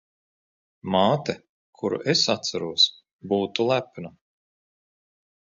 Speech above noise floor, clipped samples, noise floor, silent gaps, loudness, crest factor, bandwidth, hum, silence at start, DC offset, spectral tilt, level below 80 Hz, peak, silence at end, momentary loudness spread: over 66 dB; under 0.1%; under -90 dBFS; 1.49-1.73 s, 3.13-3.19 s; -23 LUFS; 22 dB; 7.6 kHz; none; 0.85 s; under 0.1%; -4 dB/octave; -62 dBFS; -6 dBFS; 1.3 s; 19 LU